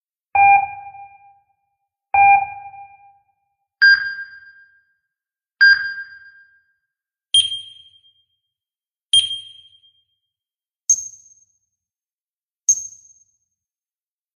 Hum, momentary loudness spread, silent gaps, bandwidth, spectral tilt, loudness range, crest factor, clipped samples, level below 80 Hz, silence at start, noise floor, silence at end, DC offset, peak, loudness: none; 24 LU; 12.13-12.26 s; 13 kHz; 3.5 dB/octave; 6 LU; 18 dB; under 0.1%; -64 dBFS; 0.35 s; under -90 dBFS; 1.5 s; under 0.1%; -4 dBFS; -15 LUFS